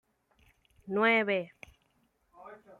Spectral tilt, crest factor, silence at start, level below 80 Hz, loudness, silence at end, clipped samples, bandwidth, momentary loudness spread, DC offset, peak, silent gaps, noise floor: -6 dB/octave; 20 dB; 0.85 s; -72 dBFS; -28 LUFS; 0.25 s; under 0.1%; 11.5 kHz; 26 LU; under 0.1%; -14 dBFS; none; -73 dBFS